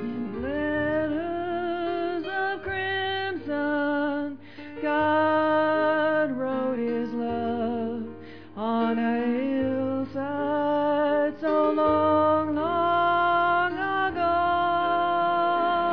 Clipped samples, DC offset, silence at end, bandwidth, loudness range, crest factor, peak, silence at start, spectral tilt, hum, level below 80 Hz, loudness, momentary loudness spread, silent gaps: under 0.1%; 0.4%; 0 s; 5.4 kHz; 5 LU; 12 dB; -12 dBFS; 0 s; -8 dB/octave; none; -56 dBFS; -25 LUFS; 8 LU; none